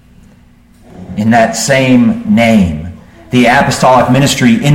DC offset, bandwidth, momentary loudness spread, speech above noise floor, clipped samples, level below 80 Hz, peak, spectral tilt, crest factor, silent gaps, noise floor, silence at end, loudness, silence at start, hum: under 0.1%; 16.5 kHz; 8 LU; 34 dB; under 0.1%; -36 dBFS; 0 dBFS; -5 dB/octave; 10 dB; none; -42 dBFS; 0 s; -9 LUFS; 0.95 s; none